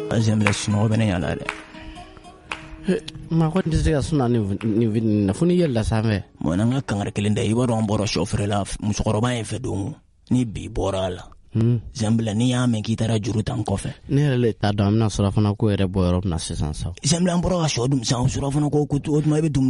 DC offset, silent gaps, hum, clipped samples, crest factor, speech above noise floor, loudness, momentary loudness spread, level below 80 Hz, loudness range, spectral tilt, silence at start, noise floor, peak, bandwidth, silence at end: under 0.1%; none; none; under 0.1%; 18 dB; 22 dB; -22 LUFS; 8 LU; -38 dBFS; 3 LU; -6 dB/octave; 0 s; -43 dBFS; -2 dBFS; 11.5 kHz; 0 s